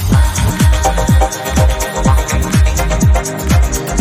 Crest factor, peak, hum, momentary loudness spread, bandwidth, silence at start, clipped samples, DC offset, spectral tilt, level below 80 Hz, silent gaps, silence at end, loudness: 12 dB; 0 dBFS; none; 2 LU; 15.5 kHz; 0 s; under 0.1%; under 0.1%; -5 dB/octave; -14 dBFS; none; 0 s; -13 LUFS